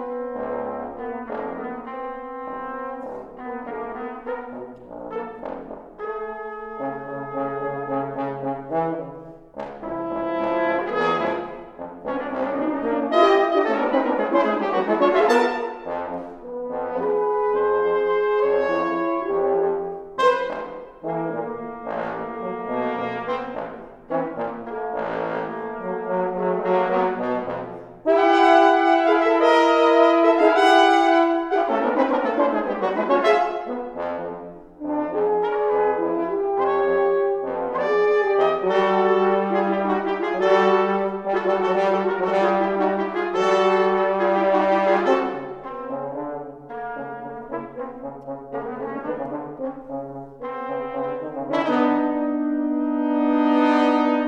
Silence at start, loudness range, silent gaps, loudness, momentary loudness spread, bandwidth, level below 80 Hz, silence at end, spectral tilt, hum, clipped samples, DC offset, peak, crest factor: 0 s; 14 LU; none; -22 LUFS; 16 LU; 9.2 kHz; -58 dBFS; 0 s; -6 dB/octave; none; under 0.1%; under 0.1%; -2 dBFS; 18 dB